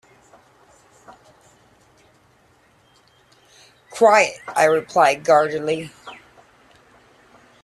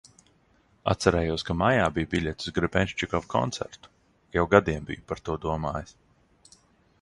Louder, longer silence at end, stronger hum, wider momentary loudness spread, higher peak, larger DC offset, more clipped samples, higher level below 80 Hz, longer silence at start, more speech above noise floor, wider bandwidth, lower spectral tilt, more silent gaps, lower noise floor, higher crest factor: first, -17 LUFS vs -27 LUFS; first, 1.5 s vs 1.1 s; neither; first, 23 LU vs 13 LU; about the same, -2 dBFS vs -2 dBFS; neither; neither; second, -66 dBFS vs -44 dBFS; first, 3.95 s vs 0.85 s; about the same, 40 dB vs 38 dB; first, 13 kHz vs 11.5 kHz; second, -3.5 dB/octave vs -5.5 dB/octave; neither; second, -57 dBFS vs -64 dBFS; second, 20 dB vs 26 dB